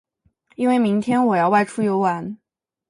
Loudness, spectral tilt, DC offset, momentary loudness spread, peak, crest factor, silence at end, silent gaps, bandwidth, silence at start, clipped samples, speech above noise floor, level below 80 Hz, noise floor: -19 LUFS; -7 dB/octave; under 0.1%; 11 LU; -6 dBFS; 16 dB; 0.55 s; none; 11.5 kHz; 0.6 s; under 0.1%; 43 dB; -66 dBFS; -61 dBFS